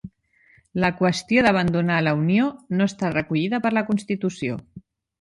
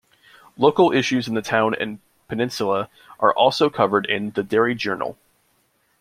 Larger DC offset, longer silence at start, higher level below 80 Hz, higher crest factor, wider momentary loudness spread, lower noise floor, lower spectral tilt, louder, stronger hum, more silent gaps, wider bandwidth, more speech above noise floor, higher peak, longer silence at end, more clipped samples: neither; second, 0.05 s vs 0.6 s; first, -54 dBFS vs -62 dBFS; about the same, 18 dB vs 20 dB; second, 8 LU vs 11 LU; second, -59 dBFS vs -65 dBFS; first, -6.5 dB/octave vs -5 dB/octave; about the same, -22 LUFS vs -20 LUFS; neither; neither; second, 11.5 kHz vs 15 kHz; second, 37 dB vs 45 dB; about the same, -4 dBFS vs -2 dBFS; second, 0.4 s vs 0.85 s; neither